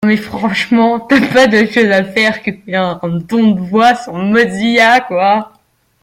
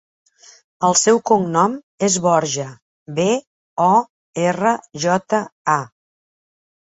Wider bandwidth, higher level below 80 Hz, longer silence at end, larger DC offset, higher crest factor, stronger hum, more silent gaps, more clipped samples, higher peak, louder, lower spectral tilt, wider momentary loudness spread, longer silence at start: first, 14.5 kHz vs 8.2 kHz; first, -50 dBFS vs -62 dBFS; second, 0.55 s vs 0.95 s; neither; second, 12 dB vs 18 dB; neither; second, none vs 1.83-1.98 s, 2.82-3.06 s, 3.47-3.77 s, 4.10-4.34 s, 5.52-5.65 s; neither; about the same, 0 dBFS vs -2 dBFS; first, -12 LUFS vs -18 LUFS; first, -5.5 dB/octave vs -4 dB/octave; about the same, 8 LU vs 10 LU; second, 0 s vs 0.8 s